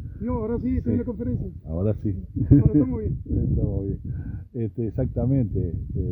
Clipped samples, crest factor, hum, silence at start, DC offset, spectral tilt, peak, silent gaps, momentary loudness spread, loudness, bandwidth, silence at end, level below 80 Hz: under 0.1%; 22 dB; none; 0 s; under 0.1%; -14 dB/octave; -2 dBFS; none; 12 LU; -25 LUFS; 2.6 kHz; 0 s; -34 dBFS